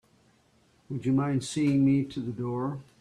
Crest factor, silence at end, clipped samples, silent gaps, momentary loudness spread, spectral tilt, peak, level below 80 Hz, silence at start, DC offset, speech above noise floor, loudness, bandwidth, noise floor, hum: 14 dB; 0.2 s; under 0.1%; none; 10 LU; -7 dB/octave; -14 dBFS; -62 dBFS; 0.9 s; under 0.1%; 37 dB; -28 LUFS; 11 kHz; -64 dBFS; none